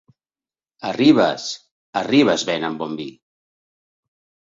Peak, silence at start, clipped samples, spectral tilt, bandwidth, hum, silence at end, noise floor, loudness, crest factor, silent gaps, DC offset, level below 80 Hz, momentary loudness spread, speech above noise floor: -2 dBFS; 0.85 s; under 0.1%; -4.5 dB/octave; 7.8 kHz; none; 1.3 s; under -90 dBFS; -19 LUFS; 20 dB; 1.71-1.93 s; under 0.1%; -62 dBFS; 16 LU; over 72 dB